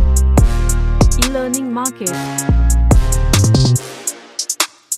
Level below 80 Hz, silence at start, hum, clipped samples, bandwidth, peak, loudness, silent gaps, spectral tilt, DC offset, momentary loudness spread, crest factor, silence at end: -16 dBFS; 0 s; none; under 0.1%; 16 kHz; 0 dBFS; -15 LUFS; none; -4.5 dB/octave; under 0.1%; 8 LU; 14 dB; 0 s